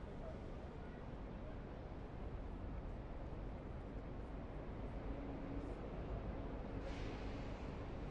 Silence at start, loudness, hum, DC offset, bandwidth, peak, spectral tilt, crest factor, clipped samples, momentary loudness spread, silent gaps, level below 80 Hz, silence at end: 0 s; -50 LUFS; none; under 0.1%; 7.8 kHz; -34 dBFS; -8 dB/octave; 14 dB; under 0.1%; 4 LU; none; -50 dBFS; 0 s